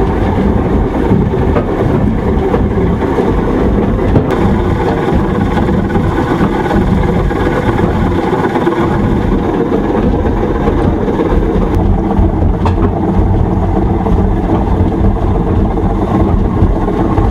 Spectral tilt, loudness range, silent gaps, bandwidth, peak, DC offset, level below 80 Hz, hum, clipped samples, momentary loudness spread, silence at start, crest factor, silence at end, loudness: -9 dB/octave; 0 LU; none; 10 kHz; 0 dBFS; under 0.1%; -18 dBFS; none; under 0.1%; 1 LU; 0 s; 10 dB; 0 s; -12 LUFS